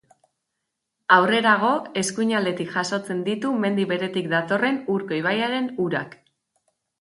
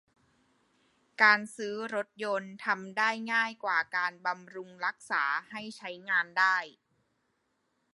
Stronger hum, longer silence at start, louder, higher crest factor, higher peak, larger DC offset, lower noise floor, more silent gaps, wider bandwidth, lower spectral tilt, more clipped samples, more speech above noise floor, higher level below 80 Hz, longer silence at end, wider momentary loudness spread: neither; about the same, 1.1 s vs 1.2 s; first, -22 LUFS vs -29 LUFS; about the same, 22 dB vs 24 dB; first, -2 dBFS vs -8 dBFS; neither; about the same, -80 dBFS vs -77 dBFS; neither; about the same, 11.5 kHz vs 11.5 kHz; first, -4.5 dB/octave vs -3 dB/octave; neither; first, 58 dB vs 46 dB; first, -70 dBFS vs -86 dBFS; second, 0.9 s vs 1.25 s; second, 8 LU vs 16 LU